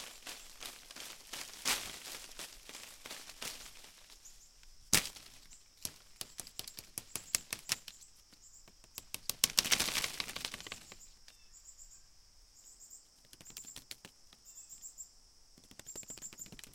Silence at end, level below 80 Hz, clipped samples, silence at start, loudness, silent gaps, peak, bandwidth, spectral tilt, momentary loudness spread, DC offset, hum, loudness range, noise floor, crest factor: 0 s; -64 dBFS; under 0.1%; 0 s; -38 LUFS; none; -4 dBFS; 17 kHz; 0 dB/octave; 26 LU; under 0.1%; none; 17 LU; -62 dBFS; 40 dB